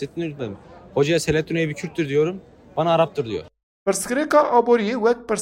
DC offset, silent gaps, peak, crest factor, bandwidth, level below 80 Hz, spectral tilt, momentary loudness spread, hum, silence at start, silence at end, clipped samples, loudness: under 0.1%; 3.63-3.86 s; -4 dBFS; 18 dB; 16 kHz; -52 dBFS; -5 dB/octave; 14 LU; none; 0 s; 0 s; under 0.1%; -21 LUFS